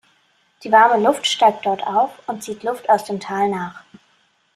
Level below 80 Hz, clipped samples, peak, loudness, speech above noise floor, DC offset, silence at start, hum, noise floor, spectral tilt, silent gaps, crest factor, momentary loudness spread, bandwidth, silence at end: -68 dBFS; under 0.1%; -2 dBFS; -18 LUFS; 43 dB; under 0.1%; 0.6 s; none; -61 dBFS; -3.5 dB/octave; none; 18 dB; 15 LU; 14 kHz; 0.75 s